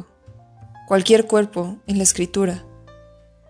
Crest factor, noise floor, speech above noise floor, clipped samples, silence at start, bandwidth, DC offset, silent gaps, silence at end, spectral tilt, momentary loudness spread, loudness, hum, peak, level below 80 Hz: 20 dB; -49 dBFS; 31 dB; under 0.1%; 0 s; 11 kHz; under 0.1%; none; 0.85 s; -4 dB/octave; 10 LU; -18 LUFS; none; -2 dBFS; -50 dBFS